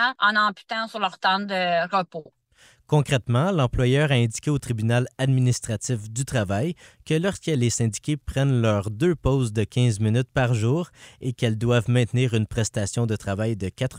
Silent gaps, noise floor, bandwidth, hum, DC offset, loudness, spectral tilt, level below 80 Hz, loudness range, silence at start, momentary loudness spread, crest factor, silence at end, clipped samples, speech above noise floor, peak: none; -57 dBFS; 15 kHz; none; under 0.1%; -23 LUFS; -5.5 dB/octave; -46 dBFS; 2 LU; 0 s; 7 LU; 16 dB; 0 s; under 0.1%; 34 dB; -6 dBFS